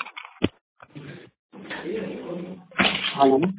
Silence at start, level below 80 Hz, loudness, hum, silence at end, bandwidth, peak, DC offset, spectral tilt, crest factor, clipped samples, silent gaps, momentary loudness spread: 0 s; -54 dBFS; -25 LUFS; none; 0 s; 4 kHz; -6 dBFS; under 0.1%; -3 dB/octave; 20 dB; under 0.1%; 0.61-0.76 s, 1.39-1.49 s; 24 LU